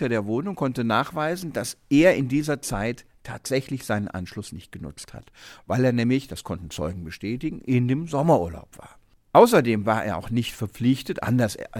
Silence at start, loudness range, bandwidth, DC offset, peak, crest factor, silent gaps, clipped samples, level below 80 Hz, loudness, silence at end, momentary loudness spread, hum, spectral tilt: 0 s; 6 LU; 17.5 kHz; under 0.1%; -2 dBFS; 22 dB; none; under 0.1%; -50 dBFS; -24 LUFS; 0 s; 19 LU; none; -6 dB/octave